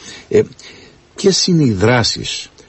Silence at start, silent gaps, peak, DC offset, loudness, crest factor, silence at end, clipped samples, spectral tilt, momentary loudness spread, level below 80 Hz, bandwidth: 0 s; none; -2 dBFS; under 0.1%; -14 LUFS; 14 dB; 0.2 s; under 0.1%; -4.5 dB/octave; 9 LU; -42 dBFS; 8.6 kHz